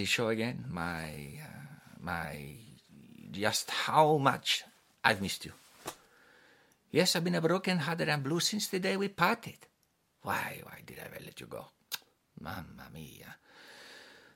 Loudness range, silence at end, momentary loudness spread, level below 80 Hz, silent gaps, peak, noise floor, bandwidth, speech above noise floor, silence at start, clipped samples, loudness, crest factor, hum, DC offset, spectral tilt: 11 LU; 0.2 s; 21 LU; -66 dBFS; none; -6 dBFS; -75 dBFS; 16.5 kHz; 42 dB; 0 s; under 0.1%; -32 LUFS; 28 dB; none; under 0.1%; -4 dB/octave